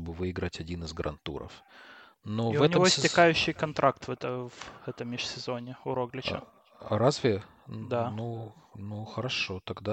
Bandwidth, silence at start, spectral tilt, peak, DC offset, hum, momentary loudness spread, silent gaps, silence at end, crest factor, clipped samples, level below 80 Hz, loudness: 9.2 kHz; 0 s; -4.5 dB/octave; -8 dBFS; under 0.1%; none; 19 LU; none; 0 s; 22 dB; under 0.1%; -56 dBFS; -29 LUFS